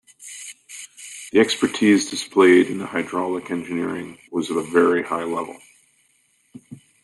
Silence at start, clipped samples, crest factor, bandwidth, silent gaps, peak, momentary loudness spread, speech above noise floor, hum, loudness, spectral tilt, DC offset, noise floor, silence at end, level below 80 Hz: 0.2 s; under 0.1%; 18 dB; 12 kHz; none; -4 dBFS; 20 LU; 43 dB; none; -20 LUFS; -4 dB/octave; under 0.1%; -63 dBFS; 0.3 s; -66 dBFS